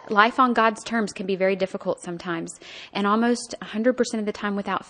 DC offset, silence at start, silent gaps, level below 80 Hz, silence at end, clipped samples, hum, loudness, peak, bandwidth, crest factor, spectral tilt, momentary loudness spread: under 0.1%; 0.05 s; none; -64 dBFS; 0.05 s; under 0.1%; none; -24 LUFS; -2 dBFS; 10 kHz; 22 dB; -4.5 dB/octave; 12 LU